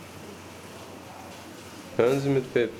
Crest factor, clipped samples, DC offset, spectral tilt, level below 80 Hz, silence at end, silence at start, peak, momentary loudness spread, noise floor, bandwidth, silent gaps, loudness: 20 dB; under 0.1%; under 0.1%; -6 dB/octave; -64 dBFS; 0 s; 0 s; -10 dBFS; 19 LU; -43 dBFS; 17 kHz; none; -25 LUFS